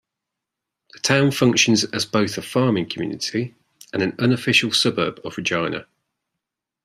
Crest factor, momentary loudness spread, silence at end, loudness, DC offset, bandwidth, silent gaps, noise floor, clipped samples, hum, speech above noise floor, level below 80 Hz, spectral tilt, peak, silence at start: 20 dB; 11 LU; 1 s; -20 LUFS; under 0.1%; 15 kHz; none; -83 dBFS; under 0.1%; none; 63 dB; -62 dBFS; -4 dB/octave; -2 dBFS; 0.95 s